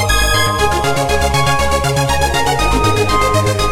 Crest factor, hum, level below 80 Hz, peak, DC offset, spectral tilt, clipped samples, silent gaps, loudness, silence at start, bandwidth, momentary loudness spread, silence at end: 12 dB; none; -22 dBFS; 0 dBFS; 4%; -4 dB/octave; under 0.1%; none; -14 LUFS; 0 s; 17 kHz; 2 LU; 0 s